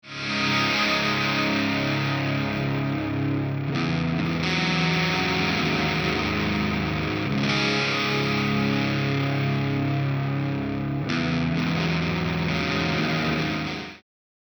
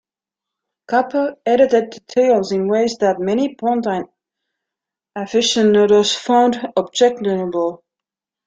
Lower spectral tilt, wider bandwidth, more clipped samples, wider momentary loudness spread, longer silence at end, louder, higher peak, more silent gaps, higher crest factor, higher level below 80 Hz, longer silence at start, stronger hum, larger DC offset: first, -5.5 dB/octave vs -4 dB/octave; first, over 20 kHz vs 9.2 kHz; neither; second, 5 LU vs 9 LU; second, 0.55 s vs 0.7 s; second, -24 LUFS vs -17 LUFS; second, -10 dBFS vs -2 dBFS; neither; about the same, 16 dB vs 16 dB; first, -48 dBFS vs -60 dBFS; second, 0.05 s vs 0.9 s; neither; neither